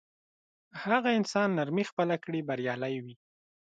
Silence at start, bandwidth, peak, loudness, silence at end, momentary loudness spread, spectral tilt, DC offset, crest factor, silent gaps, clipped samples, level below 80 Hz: 0.75 s; 9.2 kHz; -12 dBFS; -30 LUFS; 0.5 s; 12 LU; -6 dB/octave; under 0.1%; 20 dB; 1.92-1.97 s; under 0.1%; -78 dBFS